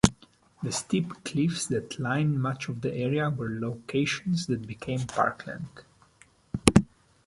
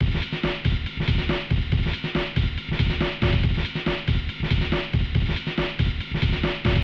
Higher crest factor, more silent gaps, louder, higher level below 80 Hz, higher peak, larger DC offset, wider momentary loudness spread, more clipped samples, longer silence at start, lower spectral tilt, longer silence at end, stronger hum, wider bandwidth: first, 28 dB vs 14 dB; neither; second, -28 LUFS vs -25 LUFS; second, -48 dBFS vs -28 dBFS; first, 0 dBFS vs -8 dBFS; neither; first, 12 LU vs 3 LU; neither; about the same, 0.05 s vs 0 s; second, -5 dB/octave vs -7.5 dB/octave; first, 0.4 s vs 0 s; neither; first, 12 kHz vs 6.8 kHz